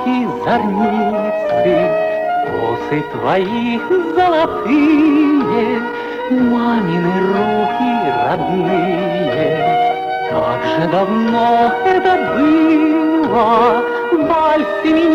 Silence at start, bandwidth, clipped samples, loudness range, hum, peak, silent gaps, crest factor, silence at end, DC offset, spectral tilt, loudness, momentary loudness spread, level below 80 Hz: 0 s; 7.2 kHz; under 0.1%; 3 LU; none; -4 dBFS; none; 10 dB; 0 s; under 0.1%; -7.5 dB/octave; -15 LUFS; 6 LU; -48 dBFS